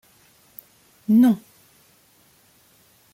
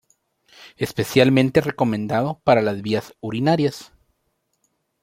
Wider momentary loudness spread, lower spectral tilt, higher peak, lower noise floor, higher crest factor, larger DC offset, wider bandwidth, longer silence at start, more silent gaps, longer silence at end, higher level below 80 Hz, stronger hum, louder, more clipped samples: first, 28 LU vs 11 LU; about the same, -7.5 dB/octave vs -6.5 dB/octave; second, -8 dBFS vs -2 dBFS; second, -58 dBFS vs -71 dBFS; about the same, 16 dB vs 20 dB; neither; about the same, 16.5 kHz vs 16.5 kHz; first, 1.1 s vs 0.6 s; neither; first, 1.75 s vs 1.2 s; second, -70 dBFS vs -56 dBFS; neither; about the same, -19 LUFS vs -20 LUFS; neither